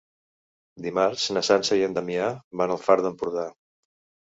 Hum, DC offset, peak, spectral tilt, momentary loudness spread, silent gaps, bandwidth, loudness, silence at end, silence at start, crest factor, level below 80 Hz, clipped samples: none; under 0.1%; -4 dBFS; -4 dB/octave; 9 LU; 2.44-2.51 s; 8 kHz; -24 LUFS; 0.75 s; 0.75 s; 22 dB; -66 dBFS; under 0.1%